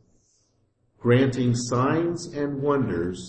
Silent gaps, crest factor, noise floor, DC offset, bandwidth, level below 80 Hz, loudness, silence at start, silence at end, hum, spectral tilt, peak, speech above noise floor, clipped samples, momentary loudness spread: none; 16 dB; -68 dBFS; under 0.1%; 8.8 kHz; -54 dBFS; -24 LUFS; 1.05 s; 0 s; none; -6.5 dB/octave; -8 dBFS; 45 dB; under 0.1%; 9 LU